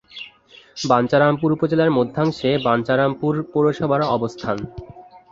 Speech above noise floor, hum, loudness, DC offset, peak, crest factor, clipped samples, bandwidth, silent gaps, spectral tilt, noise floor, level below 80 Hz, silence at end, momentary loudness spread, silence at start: 29 dB; none; -19 LUFS; under 0.1%; -2 dBFS; 18 dB; under 0.1%; 7.8 kHz; none; -6.5 dB/octave; -48 dBFS; -52 dBFS; 0.15 s; 18 LU; 0.15 s